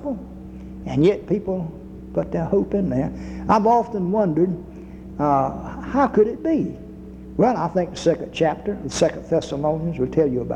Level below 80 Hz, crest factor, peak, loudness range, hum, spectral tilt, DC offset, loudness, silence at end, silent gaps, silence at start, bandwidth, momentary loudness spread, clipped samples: -42 dBFS; 16 dB; -4 dBFS; 2 LU; none; -7 dB/octave; under 0.1%; -22 LUFS; 0 s; none; 0 s; 10.5 kHz; 16 LU; under 0.1%